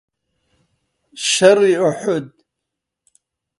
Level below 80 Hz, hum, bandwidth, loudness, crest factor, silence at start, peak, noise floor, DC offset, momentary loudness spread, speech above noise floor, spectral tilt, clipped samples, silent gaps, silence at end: -66 dBFS; none; 11.5 kHz; -15 LUFS; 20 dB; 1.15 s; 0 dBFS; -80 dBFS; under 0.1%; 11 LU; 66 dB; -3.5 dB/octave; under 0.1%; none; 1.3 s